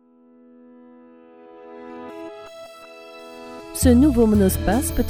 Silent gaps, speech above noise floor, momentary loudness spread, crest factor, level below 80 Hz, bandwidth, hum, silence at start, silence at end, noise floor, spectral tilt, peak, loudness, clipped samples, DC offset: none; 35 dB; 25 LU; 18 dB; -34 dBFS; 19 kHz; none; 1.65 s; 0 s; -52 dBFS; -6 dB/octave; -4 dBFS; -18 LUFS; under 0.1%; under 0.1%